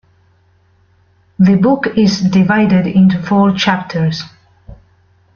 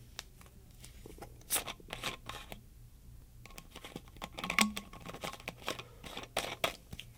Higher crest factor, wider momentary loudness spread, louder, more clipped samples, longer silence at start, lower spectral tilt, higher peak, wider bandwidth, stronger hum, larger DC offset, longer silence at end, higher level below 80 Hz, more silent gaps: second, 12 dB vs 32 dB; second, 7 LU vs 23 LU; first, -12 LUFS vs -38 LUFS; neither; first, 1.4 s vs 0 s; first, -7 dB/octave vs -2 dB/octave; first, 0 dBFS vs -8 dBFS; second, 6.8 kHz vs 18 kHz; neither; neither; first, 0.6 s vs 0 s; first, -46 dBFS vs -56 dBFS; neither